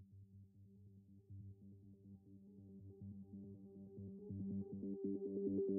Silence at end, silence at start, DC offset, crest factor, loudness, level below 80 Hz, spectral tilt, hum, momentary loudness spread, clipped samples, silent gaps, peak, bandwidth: 0 s; 0 s; under 0.1%; 18 dB; -49 LUFS; -80 dBFS; -11.5 dB/octave; none; 20 LU; under 0.1%; none; -32 dBFS; 1.2 kHz